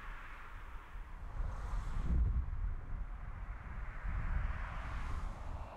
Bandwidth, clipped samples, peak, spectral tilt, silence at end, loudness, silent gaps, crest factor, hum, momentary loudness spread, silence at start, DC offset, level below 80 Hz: 8.6 kHz; under 0.1%; -24 dBFS; -7 dB/octave; 0 s; -44 LUFS; none; 16 dB; none; 14 LU; 0 s; under 0.1%; -40 dBFS